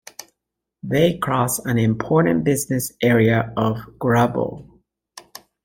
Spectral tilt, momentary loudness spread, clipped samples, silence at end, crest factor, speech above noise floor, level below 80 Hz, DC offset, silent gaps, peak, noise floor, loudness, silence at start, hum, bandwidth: -6 dB/octave; 21 LU; under 0.1%; 0.45 s; 18 dB; 62 dB; -50 dBFS; under 0.1%; none; -4 dBFS; -81 dBFS; -19 LUFS; 0.85 s; none; 17 kHz